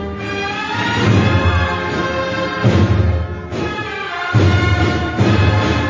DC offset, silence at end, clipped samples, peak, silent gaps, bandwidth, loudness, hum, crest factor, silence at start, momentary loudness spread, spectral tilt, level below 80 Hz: under 0.1%; 0 s; under 0.1%; -2 dBFS; none; 7.6 kHz; -16 LUFS; none; 14 dB; 0 s; 9 LU; -6.5 dB/octave; -26 dBFS